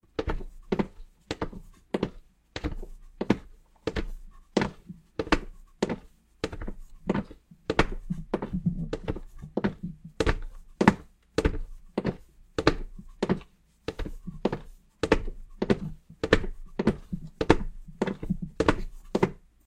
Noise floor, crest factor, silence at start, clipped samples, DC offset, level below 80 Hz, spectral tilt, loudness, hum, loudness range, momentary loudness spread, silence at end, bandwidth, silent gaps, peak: -52 dBFS; 30 dB; 0.2 s; under 0.1%; under 0.1%; -38 dBFS; -6.5 dB/octave; -31 LUFS; none; 5 LU; 15 LU; 0.3 s; 11.5 kHz; none; 0 dBFS